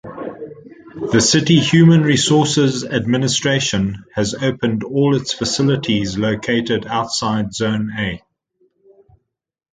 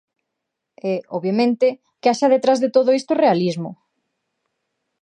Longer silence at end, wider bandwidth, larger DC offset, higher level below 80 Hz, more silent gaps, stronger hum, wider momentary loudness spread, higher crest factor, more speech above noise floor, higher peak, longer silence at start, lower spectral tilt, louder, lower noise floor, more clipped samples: first, 1.55 s vs 1.3 s; about the same, 9.6 kHz vs 10 kHz; neither; first, -46 dBFS vs -74 dBFS; neither; neither; first, 12 LU vs 9 LU; about the same, 16 dB vs 16 dB; about the same, 62 dB vs 62 dB; first, 0 dBFS vs -4 dBFS; second, 0.05 s vs 0.85 s; second, -4.5 dB/octave vs -6 dB/octave; about the same, -16 LUFS vs -18 LUFS; about the same, -78 dBFS vs -80 dBFS; neither